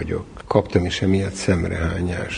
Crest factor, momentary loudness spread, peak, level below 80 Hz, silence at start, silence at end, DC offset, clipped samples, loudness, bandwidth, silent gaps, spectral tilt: 20 dB; 6 LU; -2 dBFS; -32 dBFS; 0 s; 0 s; under 0.1%; under 0.1%; -22 LUFS; 10.5 kHz; none; -6 dB/octave